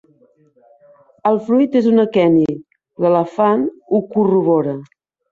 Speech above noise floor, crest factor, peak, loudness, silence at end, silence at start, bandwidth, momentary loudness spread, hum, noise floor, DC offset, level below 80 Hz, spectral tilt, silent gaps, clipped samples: 39 dB; 14 dB; -2 dBFS; -16 LUFS; 0.45 s; 1.25 s; 7.2 kHz; 8 LU; none; -54 dBFS; under 0.1%; -60 dBFS; -9 dB/octave; none; under 0.1%